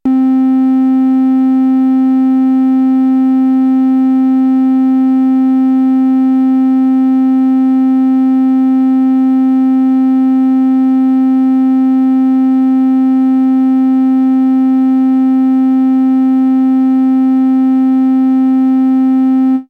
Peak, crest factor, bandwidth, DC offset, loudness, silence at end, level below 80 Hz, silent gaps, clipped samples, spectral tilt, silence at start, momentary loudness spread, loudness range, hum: -4 dBFS; 4 dB; 3.3 kHz; under 0.1%; -10 LUFS; 0.05 s; -66 dBFS; none; under 0.1%; -7.5 dB/octave; 0.05 s; 0 LU; 0 LU; none